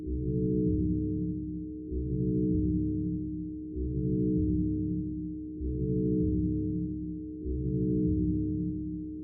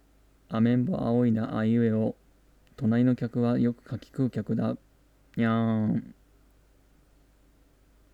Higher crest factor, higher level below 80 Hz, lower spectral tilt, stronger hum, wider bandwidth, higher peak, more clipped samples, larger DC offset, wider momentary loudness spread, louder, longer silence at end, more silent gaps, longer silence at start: about the same, 12 dB vs 16 dB; first, -40 dBFS vs -60 dBFS; first, -23.5 dB/octave vs -9.5 dB/octave; neither; second, 0.7 kHz vs 5 kHz; second, -18 dBFS vs -12 dBFS; neither; neither; about the same, 9 LU vs 10 LU; second, -31 LUFS vs -27 LUFS; second, 0 s vs 2 s; neither; second, 0 s vs 0.5 s